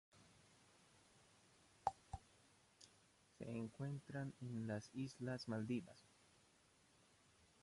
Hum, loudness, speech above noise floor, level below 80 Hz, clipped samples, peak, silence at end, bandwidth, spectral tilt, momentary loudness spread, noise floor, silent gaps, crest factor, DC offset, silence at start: none; -49 LUFS; 27 dB; -72 dBFS; under 0.1%; -24 dBFS; 0.2 s; 11.5 kHz; -6.5 dB/octave; 20 LU; -74 dBFS; none; 26 dB; under 0.1%; 0.15 s